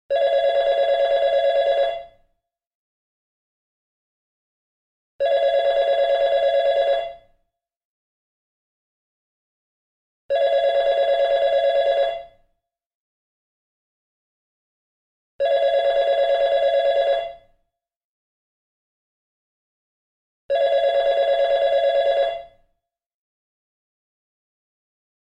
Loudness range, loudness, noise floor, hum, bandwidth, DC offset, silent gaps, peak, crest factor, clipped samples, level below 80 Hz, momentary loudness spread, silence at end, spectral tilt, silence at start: 10 LU; -20 LUFS; -74 dBFS; none; 7.6 kHz; under 0.1%; 2.67-5.19 s, 7.76-10.29 s, 12.86-15.39 s, 18.04-20.49 s; -10 dBFS; 12 dB; under 0.1%; -58 dBFS; 6 LU; 2.85 s; -2 dB/octave; 0.1 s